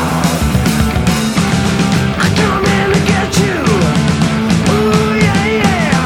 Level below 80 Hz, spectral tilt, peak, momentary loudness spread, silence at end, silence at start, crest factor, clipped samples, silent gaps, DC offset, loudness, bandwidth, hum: -26 dBFS; -5.5 dB/octave; 0 dBFS; 2 LU; 0 s; 0 s; 12 dB; under 0.1%; none; under 0.1%; -12 LUFS; 17 kHz; none